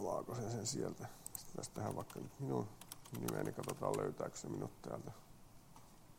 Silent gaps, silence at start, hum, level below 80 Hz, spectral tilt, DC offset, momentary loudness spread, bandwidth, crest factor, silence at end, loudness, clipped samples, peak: none; 0 s; none; -68 dBFS; -5 dB/octave; under 0.1%; 20 LU; 16.5 kHz; 22 dB; 0 s; -45 LUFS; under 0.1%; -24 dBFS